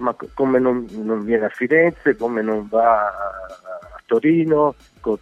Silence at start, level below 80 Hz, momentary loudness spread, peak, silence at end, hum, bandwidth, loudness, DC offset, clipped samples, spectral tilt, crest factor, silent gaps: 0 s; -52 dBFS; 14 LU; -4 dBFS; 0.05 s; none; 7.6 kHz; -19 LUFS; under 0.1%; under 0.1%; -8.5 dB/octave; 16 dB; none